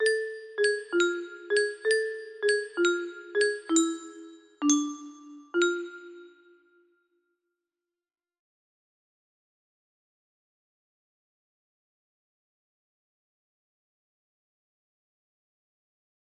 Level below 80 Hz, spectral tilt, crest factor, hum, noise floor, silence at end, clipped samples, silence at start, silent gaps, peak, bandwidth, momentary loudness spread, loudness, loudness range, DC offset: -80 dBFS; -0.5 dB/octave; 22 dB; none; under -90 dBFS; 9.95 s; under 0.1%; 0 s; none; -10 dBFS; 12.5 kHz; 17 LU; -28 LUFS; 8 LU; under 0.1%